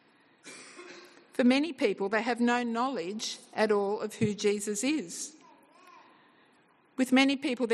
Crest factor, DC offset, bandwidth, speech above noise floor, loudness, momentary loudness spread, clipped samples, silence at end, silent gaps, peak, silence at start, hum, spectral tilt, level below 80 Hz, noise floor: 18 dB; under 0.1%; 12.5 kHz; 36 dB; -29 LUFS; 21 LU; under 0.1%; 0 s; none; -12 dBFS; 0.45 s; none; -4 dB/octave; -78 dBFS; -64 dBFS